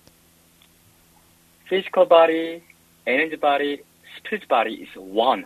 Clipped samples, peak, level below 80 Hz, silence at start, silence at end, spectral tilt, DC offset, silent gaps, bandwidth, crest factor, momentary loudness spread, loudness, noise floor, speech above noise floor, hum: under 0.1%; 0 dBFS; -68 dBFS; 1.7 s; 0 s; -4.5 dB/octave; under 0.1%; none; 13.5 kHz; 22 dB; 18 LU; -21 LUFS; -56 dBFS; 36 dB; none